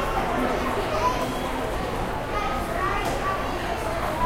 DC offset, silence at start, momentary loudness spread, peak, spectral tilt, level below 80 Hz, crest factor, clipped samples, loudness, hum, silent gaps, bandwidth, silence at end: under 0.1%; 0 s; 4 LU; -10 dBFS; -5 dB/octave; -34 dBFS; 16 dB; under 0.1%; -26 LUFS; none; none; 16 kHz; 0 s